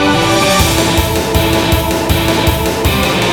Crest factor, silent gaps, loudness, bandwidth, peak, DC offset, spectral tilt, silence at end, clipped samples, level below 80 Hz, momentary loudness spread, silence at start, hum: 12 dB; none; -12 LUFS; 19.5 kHz; 0 dBFS; under 0.1%; -4 dB/octave; 0 s; under 0.1%; -22 dBFS; 3 LU; 0 s; none